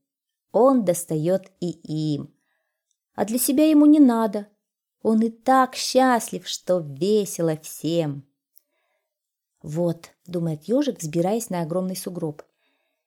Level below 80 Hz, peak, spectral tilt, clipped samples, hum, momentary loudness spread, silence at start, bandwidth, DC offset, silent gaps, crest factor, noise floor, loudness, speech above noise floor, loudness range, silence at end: -70 dBFS; -6 dBFS; -5.5 dB/octave; under 0.1%; none; 15 LU; 0.55 s; 18 kHz; under 0.1%; none; 16 dB; -83 dBFS; -22 LUFS; 62 dB; 9 LU; 0.75 s